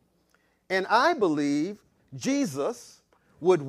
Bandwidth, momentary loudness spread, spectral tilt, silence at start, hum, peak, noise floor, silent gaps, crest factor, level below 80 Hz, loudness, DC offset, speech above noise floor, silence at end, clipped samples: 14.5 kHz; 16 LU; -5 dB/octave; 0.7 s; none; -8 dBFS; -68 dBFS; none; 20 dB; -72 dBFS; -26 LUFS; under 0.1%; 43 dB; 0 s; under 0.1%